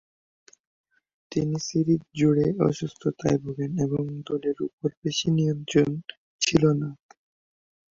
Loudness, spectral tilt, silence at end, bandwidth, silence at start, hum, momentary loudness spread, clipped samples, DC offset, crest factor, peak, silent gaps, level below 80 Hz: -26 LUFS; -6 dB/octave; 1 s; 7.6 kHz; 1.3 s; none; 9 LU; under 0.1%; under 0.1%; 20 dB; -6 dBFS; 4.73-4.78 s, 4.97-5.02 s, 6.17-6.39 s; -56 dBFS